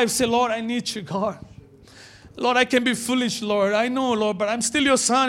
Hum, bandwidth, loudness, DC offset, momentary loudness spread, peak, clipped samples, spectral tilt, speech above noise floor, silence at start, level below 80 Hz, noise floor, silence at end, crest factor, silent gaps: none; 16.5 kHz; -22 LUFS; under 0.1%; 8 LU; -4 dBFS; under 0.1%; -3 dB/octave; 26 dB; 0 s; -58 dBFS; -47 dBFS; 0 s; 18 dB; none